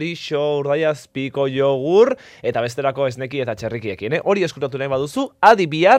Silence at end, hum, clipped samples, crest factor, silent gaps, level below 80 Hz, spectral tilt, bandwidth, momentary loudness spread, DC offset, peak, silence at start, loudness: 0 s; none; under 0.1%; 18 dB; none; -60 dBFS; -6 dB/octave; 14.5 kHz; 10 LU; under 0.1%; 0 dBFS; 0 s; -19 LUFS